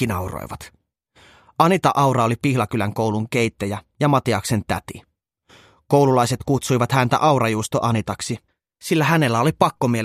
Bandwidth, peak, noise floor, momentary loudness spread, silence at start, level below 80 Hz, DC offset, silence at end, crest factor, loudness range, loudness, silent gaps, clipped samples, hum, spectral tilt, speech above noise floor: 15 kHz; 0 dBFS; -56 dBFS; 12 LU; 0 s; -50 dBFS; under 0.1%; 0 s; 20 dB; 3 LU; -20 LUFS; none; under 0.1%; none; -5.5 dB/octave; 36 dB